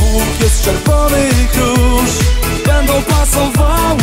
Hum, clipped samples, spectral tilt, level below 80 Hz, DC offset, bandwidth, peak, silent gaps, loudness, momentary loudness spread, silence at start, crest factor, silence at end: none; under 0.1%; -4.5 dB/octave; -14 dBFS; under 0.1%; 16.5 kHz; 0 dBFS; none; -12 LUFS; 2 LU; 0 s; 10 dB; 0 s